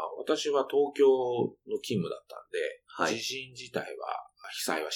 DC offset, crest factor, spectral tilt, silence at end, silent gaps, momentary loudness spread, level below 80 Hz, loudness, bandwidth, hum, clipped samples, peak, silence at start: under 0.1%; 18 dB; -4 dB/octave; 0 s; none; 14 LU; -76 dBFS; -31 LUFS; 18 kHz; none; under 0.1%; -14 dBFS; 0 s